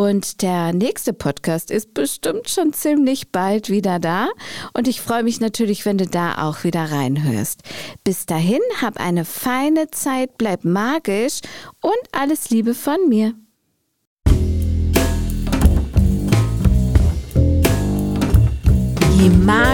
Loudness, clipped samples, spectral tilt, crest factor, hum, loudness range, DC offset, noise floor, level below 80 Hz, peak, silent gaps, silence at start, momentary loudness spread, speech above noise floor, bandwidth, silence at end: -18 LUFS; under 0.1%; -6 dB/octave; 16 dB; none; 4 LU; 0.5%; -69 dBFS; -24 dBFS; -2 dBFS; 14.07-14.17 s; 0 s; 7 LU; 50 dB; 17.5 kHz; 0 s